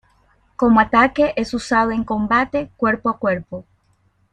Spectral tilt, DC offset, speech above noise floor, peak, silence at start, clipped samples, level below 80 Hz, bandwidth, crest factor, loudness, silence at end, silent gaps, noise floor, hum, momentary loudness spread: -6 dB/octave; under 0.1%; 43 dB; -2 dBFS; 0.6 s; under 0.1%; -46 dBFS; 10 kHz; 16 dB; -18 LUFS; 0.7 s; none; -61 dBFS; none; 9 LU